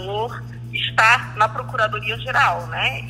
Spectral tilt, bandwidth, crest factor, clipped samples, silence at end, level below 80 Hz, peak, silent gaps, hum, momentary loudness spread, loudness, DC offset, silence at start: -3.5 dB/octave; 16 kHz; 20 dB; under 0.1%; 0 s; -46 dBFS; -2 dBFS; none; none; 12 LU; -19 LUFS; under 0.1%; 0 s